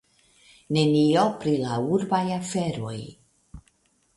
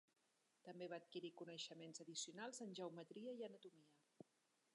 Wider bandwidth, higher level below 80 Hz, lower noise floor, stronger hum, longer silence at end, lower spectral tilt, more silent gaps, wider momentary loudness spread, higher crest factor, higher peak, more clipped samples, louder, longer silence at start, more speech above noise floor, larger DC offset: about the same, 11.5 kHz vs 11 kHz; first, -58 dBFS vs under -90 dBFS; second, -65 dBFS vs -85 dBFS; neither; about the same, 0.55 s vs 0.5 s; first, -6 dB/octave vs -3 dB/octave; neither; about the same, 14 LU vs 16 LU; about the same, 18 dB vs 20 dB; first, -8 dBFS vs -36 dBFS; neither; first, -24 LUFS vs -54 LUFS; about the same, 0.7 s vs 0.65 s; first, 42 dB vs 30 dB; neither